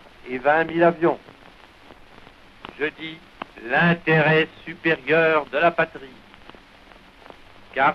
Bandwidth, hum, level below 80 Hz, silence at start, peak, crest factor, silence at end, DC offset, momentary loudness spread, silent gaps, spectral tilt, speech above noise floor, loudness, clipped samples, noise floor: 6.6 kHz; none; -56 dBFS; 0.25 s; -4 dBFS; 18 dB; 0 s; under 0.1%; 19 LU; none; -7.5 dB/octave; 28 dB; -21 LUFS; under 0.1%; -48 dBFS